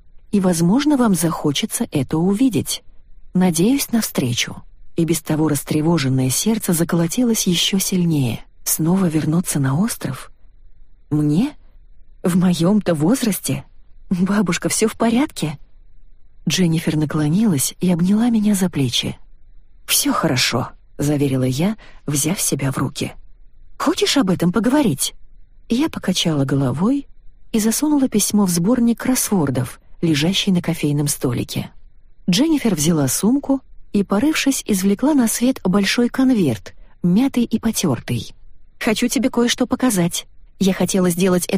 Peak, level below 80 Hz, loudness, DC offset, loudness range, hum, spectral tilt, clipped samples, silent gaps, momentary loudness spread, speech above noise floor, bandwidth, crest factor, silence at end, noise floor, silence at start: -4 dBFS; -44 dBFS; -18 LUFS; under 0.1%; 3 LU; none; -4.5 dB/octave; under 0.1%; none; 8 LU; 23 dB; 15.5 kHz; 16 dB; 0 s; -41 dBFS; 0.05 s